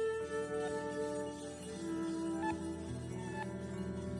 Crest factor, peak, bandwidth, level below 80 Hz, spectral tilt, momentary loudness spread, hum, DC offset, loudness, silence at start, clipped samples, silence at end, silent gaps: 14 dB; -26 dBFS; 11.5 kHz; -64 dBFS; -6 dB/octave; 6 LU; none; under 0.1%; -40 LUFS; 0 s; under 0.1%; 0 s; none